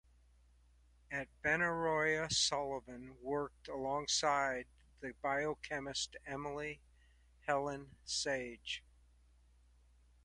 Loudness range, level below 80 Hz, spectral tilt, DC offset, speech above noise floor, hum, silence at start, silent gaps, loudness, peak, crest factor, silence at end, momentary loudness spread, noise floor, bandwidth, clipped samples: 6 LU; -64 dBFS; -2.5 dB/octave; under 0.1%; 29 dB; none; 1.1 s; none; -38 LUFS; -20 dBFS; 22 dB; 1.45 s; 14 LU; -67 dBFS; 11.5 kHz; under 0.1%